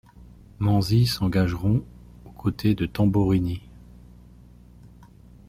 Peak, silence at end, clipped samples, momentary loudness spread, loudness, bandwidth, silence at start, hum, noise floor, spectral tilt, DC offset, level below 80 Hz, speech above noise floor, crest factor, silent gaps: -8 dBFS; 0.6 s; under 0.1%; 9 LU; -23 LUFS; 15.5 kHz; 0.2 s; 60 Hz at -40 dBFS; -49 dBFS; -7 dB/octave; under 0.1%; -44 dBFS; 27 dB; 16 dB; none